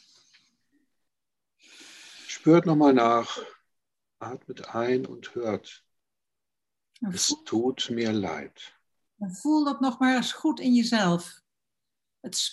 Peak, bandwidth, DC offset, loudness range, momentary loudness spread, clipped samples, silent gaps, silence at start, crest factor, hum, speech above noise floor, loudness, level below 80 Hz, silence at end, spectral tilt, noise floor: -8 dBFS; 12.5 kHz; under 0.1%; 9 LU; 20 LU; under 0.1%; none; 1.8 s; 20 dB; none; 64 dB; -25 LUFS; -74 dBFS; 0 s; -4.5 dB/octave; -89 dBFS